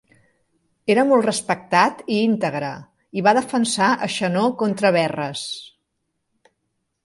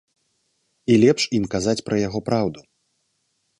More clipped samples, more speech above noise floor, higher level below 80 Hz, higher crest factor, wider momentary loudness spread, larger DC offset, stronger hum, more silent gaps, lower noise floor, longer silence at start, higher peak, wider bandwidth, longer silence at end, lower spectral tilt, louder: neither; first, 55 dB vs 51 dB; second, -66 dBFS vs -52 dBFS; about the same, 20 dB vs 20 dB; first, 12 LU vs 8 LU; neither; neither; neither; first, -75 dBFS vs -71 dBFS; about the same, 0.85 s vs 0.9 s; about the same, -2 dBFS vs -4 dBFS; about the same, 11.5 kHz vs 11 kHz; first, 1.4 s vs 1 s; about the same, -4.5 dB/octave vs -5.5 dB/octave; about the same, -20 LUFS vs -21 LUFS